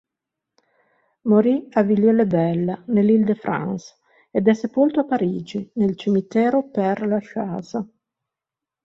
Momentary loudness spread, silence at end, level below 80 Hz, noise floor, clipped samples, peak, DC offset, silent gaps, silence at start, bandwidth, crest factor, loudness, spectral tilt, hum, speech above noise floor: 12 LU; 1 s; -62 dBFS; -87 dBFS; under 0.1%; -4 dBFS; under 0.1%; none; 1.25 s; 7.2 kHz; 18 dB; -20 LUFS; -8.5 dB/octave; none; 68 dB